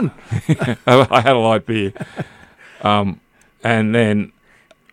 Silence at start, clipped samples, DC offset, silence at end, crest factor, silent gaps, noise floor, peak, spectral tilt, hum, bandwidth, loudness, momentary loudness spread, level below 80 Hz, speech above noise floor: 0 s; under 0.1%; under 0.1%; 0.65 s; 18 dB; none; -52 dBFS; 0 dBFS; -6.5 dB/octave; none; 13.5 kHz; -16 LUFS; 17 LU; -52 dBFS; 36 dB